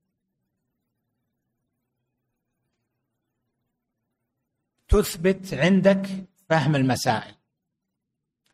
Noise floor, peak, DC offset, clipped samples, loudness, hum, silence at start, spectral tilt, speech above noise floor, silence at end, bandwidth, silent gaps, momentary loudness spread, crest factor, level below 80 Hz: -82 dBFS; -6 dBFS; under 0.1%; under 0.1%; -22 LUFS; none; 4.9 s; -6 dB/octave; 61 dB; 1.25 s; 15.5 kHz; none; 9 LU; 22 dB; -38 dBFS